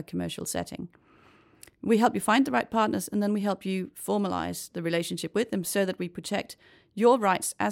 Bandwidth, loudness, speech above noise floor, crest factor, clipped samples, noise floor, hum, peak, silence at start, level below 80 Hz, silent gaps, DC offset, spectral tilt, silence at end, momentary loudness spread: 16.5 kHz; -27 LUFS; 31 dB; 20 dB; under 0.1%; -58 dBFS; none; -8 dBFS; 0 s; -66 dBFS; none; under 0.1%; -4.5 dB/octave; 0 s; 12 LU